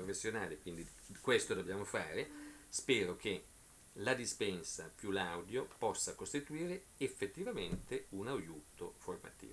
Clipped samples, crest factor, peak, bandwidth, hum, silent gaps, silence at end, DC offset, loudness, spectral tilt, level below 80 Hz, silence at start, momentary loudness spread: under 0.1%; 24 dB; -18 dBFS; 11 kHz; none; none; 0 s; under 0.1%; -41 LUFS; -3.5 dB/octave; -64 dBFS; 0 s; 14 LU